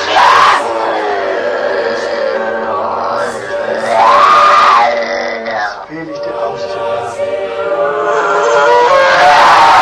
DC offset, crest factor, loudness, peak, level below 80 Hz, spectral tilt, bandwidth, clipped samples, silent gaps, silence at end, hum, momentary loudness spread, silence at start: under 0.1%; 10 dB; -10 LUFS; 0 dBFS; -50 dBFS; -2.5 dB/octave; 13 kHz; 0.4%; none; 0 s; none; 13 LU; 0 s